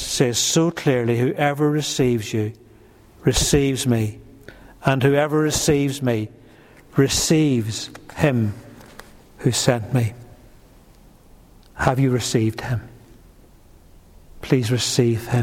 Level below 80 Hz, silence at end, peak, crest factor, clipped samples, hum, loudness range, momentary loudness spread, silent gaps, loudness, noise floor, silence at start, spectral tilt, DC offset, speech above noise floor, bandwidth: -42 dBFS; 0 s; -2 dBFS; 18 dB; under 0.1%; none; 5 LU; 10 LU; none; -20 LUFS; -49 dBFS; 0 s; -5 dB/octave; under 0.1%; 29 dB; 16.5 kHz